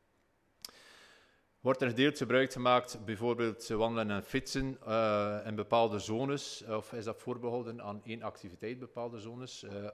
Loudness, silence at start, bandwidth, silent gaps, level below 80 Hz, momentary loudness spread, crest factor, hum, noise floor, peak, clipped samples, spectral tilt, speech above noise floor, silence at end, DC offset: -34 LUFS; 0.65 s; 15 kHz; none; -60 dBFS; 15 LU; 22 dB; none; -73 dBFS; -14 dBFS; under 0.1%; -5 dB/octave; 39 dB; 0 s; under 0.1%